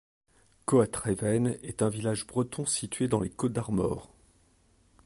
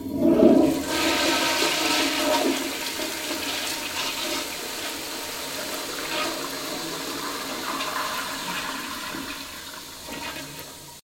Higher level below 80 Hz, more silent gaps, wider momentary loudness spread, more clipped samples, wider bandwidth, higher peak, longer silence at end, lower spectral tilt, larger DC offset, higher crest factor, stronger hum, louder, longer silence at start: about the same, -54 dBFS vs -56 dBFS; neither; second, 6 LU vs 13 LU; neither; second, 11.5 kHz vs 16.5 kHz; second, -12 dBFS vs -4 dBFS; first, 1 s vs 0.15 s; first, -5.5 dB/octave vs -2.5 dB/octave; neither; about the same, 20 dB vs 22 dB; neither; second, -30 LUFS vs -25 LUFS; first, 0.7 s vs 0 s